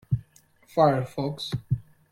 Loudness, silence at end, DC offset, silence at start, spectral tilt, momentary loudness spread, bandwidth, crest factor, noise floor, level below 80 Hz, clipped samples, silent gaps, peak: -27 LUFS; 0.3 s; under 0.1%; 0.1 s; -7.5 dB/octave; 10 LU; 15 kHz; 22 dB; -59 dBFS; -52 dBFS; under 0.1%; none; -6 dBFS